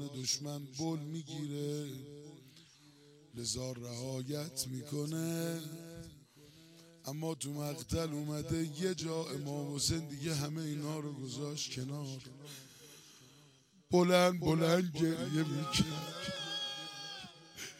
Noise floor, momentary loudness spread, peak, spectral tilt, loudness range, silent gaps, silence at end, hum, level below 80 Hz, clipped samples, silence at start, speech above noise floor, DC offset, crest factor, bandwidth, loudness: -65 dBFS; 19 LU; -14 dBFS; -4.5 dB/octave; 10 LU; none; 0 s; none; -62 dBFS; under 0.1%; 0 s; 28 dB; under 0.1%; 24 dB; 16.5 kHz; -37 LUFS